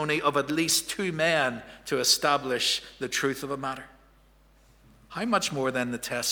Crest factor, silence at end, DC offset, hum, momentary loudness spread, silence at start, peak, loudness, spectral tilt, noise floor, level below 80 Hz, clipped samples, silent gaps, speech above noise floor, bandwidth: 22 dB; 0 s; under 0.1%; none; 11 LU; 0 s; -8 dBFS; -26 LUFS; -2.5 dB/octave; -59 dBFS; -60 dBFS; under 0.1%; none; 31 dB; over 20 kHz